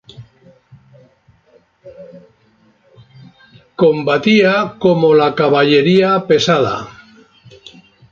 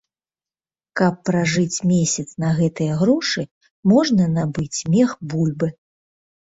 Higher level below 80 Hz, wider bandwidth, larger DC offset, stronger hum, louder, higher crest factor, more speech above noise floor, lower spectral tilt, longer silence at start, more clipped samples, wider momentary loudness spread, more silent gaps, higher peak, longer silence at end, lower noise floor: about the same, -56 dBFS vs -54 dBFS; about the same, 7.4 kHz vs 8 kHz; neither; neither; first, -13 LUFS vs -20 LUFS; about the same, 16 dB vs 18 dB; second, 42 dB vs over 71 dB; about the same, -6 dB/octave vs -5.5 dB/octave; second, 0.2 s vs 0.95 s; neither; about the same, 7 LU vs 8 LU; second, none vs 3.51-3.61 s, 3.71-3.83 s; first, 0 dBFS vs -4 dBFS; first, 1.2 s vs 0.85 s; second, -54 dBFS vs under -90 dBFS